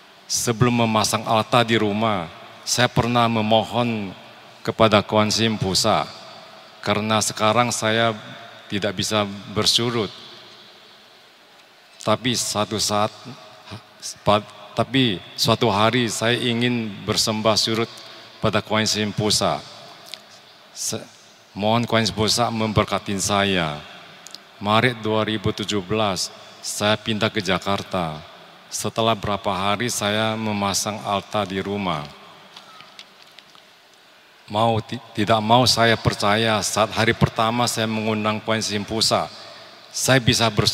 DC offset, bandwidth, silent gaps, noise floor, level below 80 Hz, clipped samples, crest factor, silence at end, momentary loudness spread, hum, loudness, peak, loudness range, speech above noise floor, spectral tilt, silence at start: under 0.1%; 16 kHz; none; -51 dBFS; -52 dBFS; under 0.1%; 22 dB; 0 s; 19 LU; none; -21 LUFS; -2 dBFS; 5 LU; 30 dB; -4 dB/octave; 0.3 s